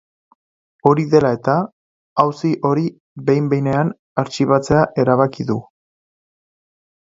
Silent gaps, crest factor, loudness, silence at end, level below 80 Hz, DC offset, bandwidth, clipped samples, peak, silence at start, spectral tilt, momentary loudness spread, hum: 1.72-2.16 s, 3.00-3.16 s, 3.99-4.16 s; 18 dB; -18 LUFS; 1.4 s; -52 dBFS; under 0.1%; 7.8 kHz; under 0.1%; 0 dBFS; 0.85 s; -7.5 dB/octave; 9 LU; none